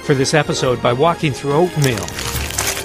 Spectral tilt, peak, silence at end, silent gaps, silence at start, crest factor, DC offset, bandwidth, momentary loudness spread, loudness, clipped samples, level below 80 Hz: -4.5 dB/octave; 0 dBFS; 0 s; none; 0 s; 16 dB; under 0.1%; 15.5 kHz; 6 LU; -17 LUFS; under 0.1%; -36 dBFS